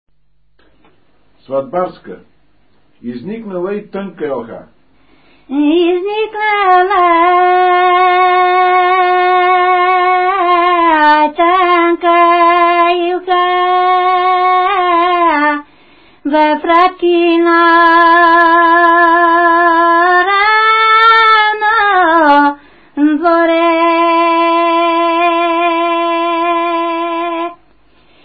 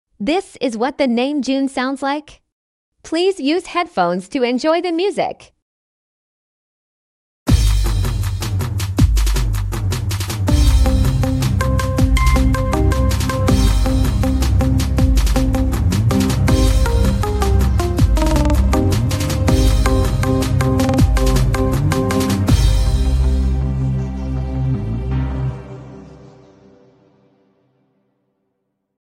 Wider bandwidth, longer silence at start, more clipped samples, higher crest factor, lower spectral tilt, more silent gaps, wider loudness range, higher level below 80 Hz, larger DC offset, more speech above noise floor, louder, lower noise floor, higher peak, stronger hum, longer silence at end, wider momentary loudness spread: second, 5 kHz vs 15.5 kHz; first, 1.5 s vs 0.2 s; neither; about the same, 10 dB vs 14 dB; about the same, -6 dB/octave vs -6 dB/octave; second, none vs 2.52-2.92 s, 5.62-7.46 s; first, 14 LU vs 6 LU; second, -52 dBFS vs -20 dBFS; first, 0.4% vs under 0.1%; about the same, 51 dB vs 53 dB; first, -10 LUFS vs -17 LUFS; second, -61 dBFS vs -72 dBFS; about the same, 0 dBFS vs -2 dBFS; neither; second, 0.7 s vs 2.9 s; first, 13 LU vs 7 LU